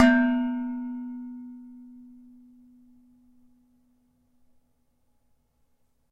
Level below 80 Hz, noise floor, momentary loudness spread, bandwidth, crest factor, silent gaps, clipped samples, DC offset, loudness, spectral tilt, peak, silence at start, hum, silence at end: -62 dBFS; -68 dBFS; 27 LU; 7.8 kHz; 26 dB; none; under 0.1%; under 0.1%; -27 LUFS; -5 dB/octave; -4 dBFS; 0 s; none; 4.05 s